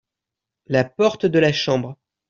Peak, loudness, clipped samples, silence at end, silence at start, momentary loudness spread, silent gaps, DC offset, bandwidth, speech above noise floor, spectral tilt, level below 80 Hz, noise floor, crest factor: -4 dBFS; -19 LUFS; under 0.1%; 0.35 s; 0.7 s; 6 LU; none; under 0.1%; 7.6 kHz; 67 dB; -6 dB/octave; -58 dBFS; -85 dBFS; 18 dB